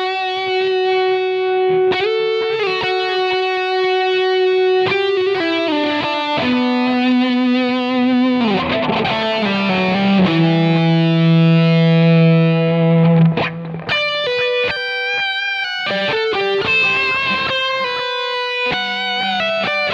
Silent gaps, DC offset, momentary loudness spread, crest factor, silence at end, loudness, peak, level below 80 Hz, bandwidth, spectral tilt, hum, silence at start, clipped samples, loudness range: none; under 0.1%; 6 LU; 12 dB; 0 s; -16 LUFS; -4 dBFS; -54 dBFS; 7 kHz; -7 dB/octave; none; 0 s; under 0.1%; 4 LU